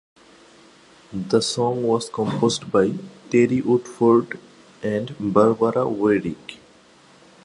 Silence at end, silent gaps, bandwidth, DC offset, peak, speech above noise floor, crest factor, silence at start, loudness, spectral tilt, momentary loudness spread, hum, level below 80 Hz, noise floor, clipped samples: 0.9 s; none; 11.5 kHz; under 0.1%; -2 dBFS; 31 dB; 20 dB; 1.1 s; -21 LUFS; -5.5 dB/octave; 16 LU; none; -58 dBFS; -52 dBFS; under 0.1%